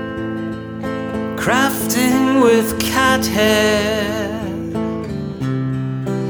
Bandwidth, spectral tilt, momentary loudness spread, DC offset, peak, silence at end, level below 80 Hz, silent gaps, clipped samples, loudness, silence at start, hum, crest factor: over 20 kHz; -4.5 dB/octave; 11 LU; under 0.1%; -2 dBFS; 0 s; -40 dBFS; none; under 0.1%; -17 LUFS; 0 s; none; 16 dB